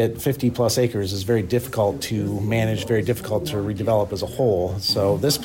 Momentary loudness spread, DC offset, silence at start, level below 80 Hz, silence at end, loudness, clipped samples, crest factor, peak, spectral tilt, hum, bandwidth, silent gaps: 5 LU; under 0.1%; 0 s; -46 dBFS; 0 s; -22 LUFS; under 0.1%; 12 dB; -8 dBFS; -5.5 dB/octave; none; 16.5 kHz; none